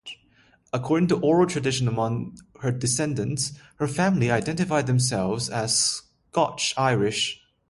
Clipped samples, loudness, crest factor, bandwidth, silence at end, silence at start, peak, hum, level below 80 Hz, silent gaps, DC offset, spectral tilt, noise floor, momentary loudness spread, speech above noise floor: under 0.1%; -24 LUFS; 18 dB; 11.5 kHz; 0.35 s; 0.05 s; -8 dBFS; none; -56 dBFS; none; under 0.1%; -4.5 dB/octave; -60 dBFS; 10 LU; 36 dB